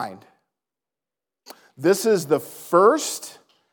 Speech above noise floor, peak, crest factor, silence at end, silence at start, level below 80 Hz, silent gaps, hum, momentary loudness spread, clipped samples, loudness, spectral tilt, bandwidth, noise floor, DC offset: 69 dB; -4 dBFS; 20 dB; 0.4 s; 0 s; -86 dBFS; none; none; 16 LU; under 0.1%; -20 LUFS; -4 dB/octave; 19.5 kHz; -89 dBFS; under 0.1%